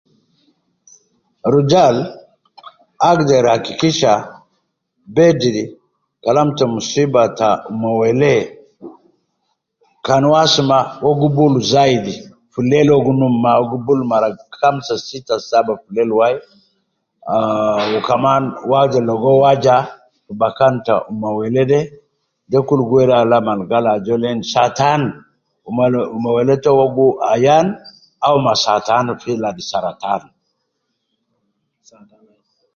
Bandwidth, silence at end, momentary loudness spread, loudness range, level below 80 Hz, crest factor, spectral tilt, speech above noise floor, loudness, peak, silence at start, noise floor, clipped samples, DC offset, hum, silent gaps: 7.4 kHz; 2.55 s; 10 LU; 4 LU; -54 dBFS; 16 dB; -6 dB/octave; 57 dB; -15 LUFS; 0 dBFS; 1.45 s; -71 dBFS; under 0.1%; under 0.1%; none; none